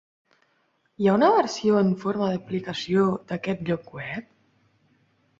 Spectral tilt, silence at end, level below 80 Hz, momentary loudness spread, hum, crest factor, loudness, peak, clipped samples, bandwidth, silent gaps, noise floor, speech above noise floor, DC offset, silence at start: -6.5 dB/octave; 1.2 s; -64 dBFS; 13 LU; none; 20 dB; -24 LUFS; -6 dBFS; under 0.1%; 7.8 kHz; none; -69 dBFS; 45 dB; under 0.1%; 1 s